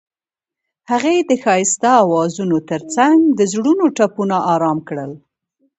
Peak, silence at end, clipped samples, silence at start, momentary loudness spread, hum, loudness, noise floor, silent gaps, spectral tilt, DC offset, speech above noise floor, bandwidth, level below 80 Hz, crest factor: 0 dBFS; 0.6 s; under 0.1%; 0.9 s; 9 LU; none; -15 LUFS; -88 dBFS; none; -4.5 dB/octave; under 0.1%; 73 dB; 8.2 kHz; -64 dBFS; 16 dB